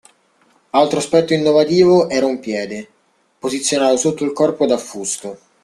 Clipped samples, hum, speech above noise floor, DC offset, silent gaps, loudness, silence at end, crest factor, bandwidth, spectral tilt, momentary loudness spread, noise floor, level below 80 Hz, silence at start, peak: under 0.1%; none; 41 dB; under 0.1%; none; -16 LUFS; 0.3 s; 16 dB; 12.5 kHz; -4.5 dB/octave; 13 LU; -57 dBFS; -58 dBFS; 0.75 s; 0 dBFS